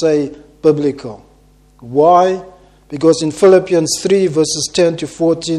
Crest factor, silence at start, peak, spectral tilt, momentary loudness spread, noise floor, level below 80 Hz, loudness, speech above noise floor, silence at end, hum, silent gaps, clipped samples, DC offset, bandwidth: 14 dB; 0 s; 0 dBFS; -5 dB/octave; 13 LU; -48 dBFS; -50 dBFS; -13 LUFS; 35 dB; 0 s; 50 Hz at -45 dBFS; none; under 0.1%; under 0.1%; 13 kHz